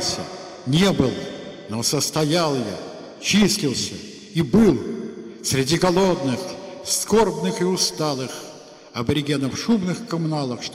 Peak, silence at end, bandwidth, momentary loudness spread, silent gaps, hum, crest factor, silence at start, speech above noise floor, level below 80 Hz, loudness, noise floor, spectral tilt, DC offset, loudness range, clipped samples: -4 dBFS; 0 s; 16 kHz; 15 LU; none; none; 18 dB; 0 s; 21 dB; -48 dBFS; -21 LUFS; -42 dBFS; -4.5 dB/octave; under 0.1%; 2 LU; under 0.1%